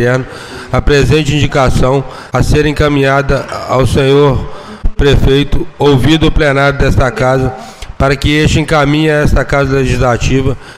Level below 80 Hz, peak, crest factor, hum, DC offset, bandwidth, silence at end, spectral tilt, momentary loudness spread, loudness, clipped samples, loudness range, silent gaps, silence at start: -18 dBFS; 0 dBFS; 10 dB; none; 0.4%; 14.5 kHz; 0.05 s; -6 dB/octave; 8 LU; -11 LUFS; under 0.1%; 1 LU; none; 0 s